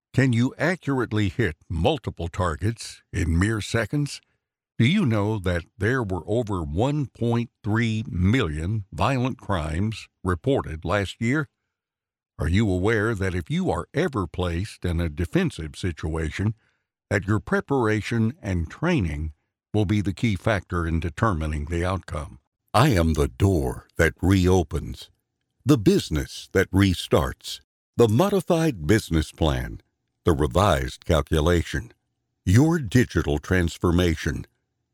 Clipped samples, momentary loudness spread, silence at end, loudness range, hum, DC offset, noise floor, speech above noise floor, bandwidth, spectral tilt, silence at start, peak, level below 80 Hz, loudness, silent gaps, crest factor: under 0.1%; 10 LU; 0.5 s; 4 LU; none; under 0.1%; -89 dBFS; 66 dB; 17 kHz; -6.5 dB/octave; 0.15 s; -6 dBFS; -38 dBFS; -24 LUFS; 22.47-22.52 s, 27.64-27.93 s; 18 dB